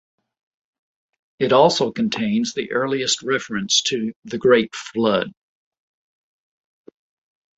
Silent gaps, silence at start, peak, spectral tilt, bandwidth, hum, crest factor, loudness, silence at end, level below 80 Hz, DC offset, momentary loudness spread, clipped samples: 4.16-4.22 s; 1.4 s; -2 dBFS; -3.5 dB/octave; 8.2 kHz; none; 20 dB; -20 LUFS; 2.3 s; -62 dBFS; under 0.1%; 10 LU; under 0.1%